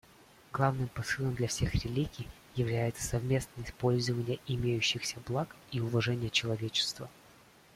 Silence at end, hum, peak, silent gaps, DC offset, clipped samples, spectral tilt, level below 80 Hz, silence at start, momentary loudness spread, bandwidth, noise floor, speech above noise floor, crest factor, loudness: 0.65 s; none; -14 dBFS; none; under 0.1%; under 0.1%; -4.5 dB/octave; -52 dBFS; 0.5 s; 8 LU; 15.5 kHz; -59 dBFS; 27 dB; 20 dB; -33 LUFS